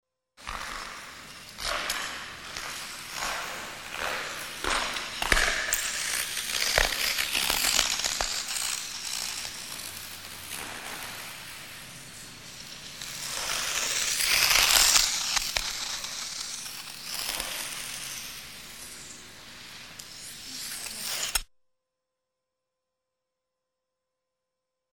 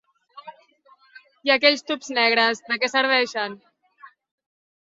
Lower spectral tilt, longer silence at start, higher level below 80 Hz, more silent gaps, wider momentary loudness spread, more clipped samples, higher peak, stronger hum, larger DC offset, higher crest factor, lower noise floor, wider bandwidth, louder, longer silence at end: second, 0.5 dB/octave vs -1.5 dB/octave; about the same, 0.35 s vs 0.35 s; first, -46 dBFS vs -76 dBFS; neither; first, 18 LU vs 10 LU; neither; about the same, -2 dBFS vs -2 dBFS; neither; first, 0.1% vs under 0.1%; first, 28 dB vs 22 dB; first, -85 dBFS vs -57 dBFS; first, 17.5 kHz vs 7.8 kHz; second, -27 LUFS vs -20 LUFS; first, 3.5 s vs 0.8 s